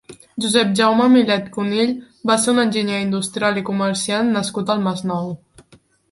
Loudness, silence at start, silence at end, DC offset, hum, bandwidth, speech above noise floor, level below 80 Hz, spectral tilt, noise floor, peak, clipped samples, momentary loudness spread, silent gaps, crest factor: -18 LUFS; 0.1 s; 0.75 s; under 0.1%; none; 11.5 kHz; 35 dB; -60 dBFS; -4.5 dB/octave; -53 dBFS; 0 dBFS; under 0.1%; 10 LU; none; 18 dB